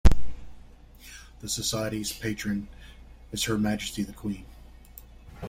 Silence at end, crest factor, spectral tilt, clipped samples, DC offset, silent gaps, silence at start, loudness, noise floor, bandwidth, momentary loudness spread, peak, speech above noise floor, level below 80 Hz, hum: 0 s; 22 dB; -4.5 dB/octave; under 0.1%; under 0.1%; none; 0.05 s; -30 LUFS; -49 dBFS; 16.5 kHz; 23 LU; -4 dBFS; 19 dB; -34 dBFS; none